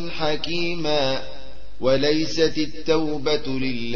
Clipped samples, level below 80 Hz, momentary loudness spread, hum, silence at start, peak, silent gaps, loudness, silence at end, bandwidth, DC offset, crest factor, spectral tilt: under 0.1%; -44 dBFS; 6 LU; none; 0 s; -6 dBFS; none; -23 LUFS; 0 s; 7.2 kHz; 6%; 16 dB; -5 dB/octave